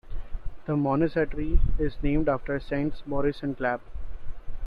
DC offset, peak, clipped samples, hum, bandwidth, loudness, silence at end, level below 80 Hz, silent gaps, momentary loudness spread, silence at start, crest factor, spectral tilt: under 0.1%; -8 dBFS; under 0.1%; none; 5 kHz; -28 LUFS; 0 s; -32 dBFS; none; 18 LU; 0.05 s; 16 dB; -9.5 dB/octave